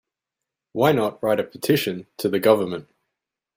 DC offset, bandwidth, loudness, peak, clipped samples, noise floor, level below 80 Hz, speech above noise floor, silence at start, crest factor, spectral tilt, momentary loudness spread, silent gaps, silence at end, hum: under 0.1%; 16 kHz; -22 LUFS; -4 dBFS; under 0.1%; -86 dBFS; -64 dBFS; 65 dB; 0.75 s; 20 dB; -5.5 dB/octave; 10 LU; none; 0.75 s; none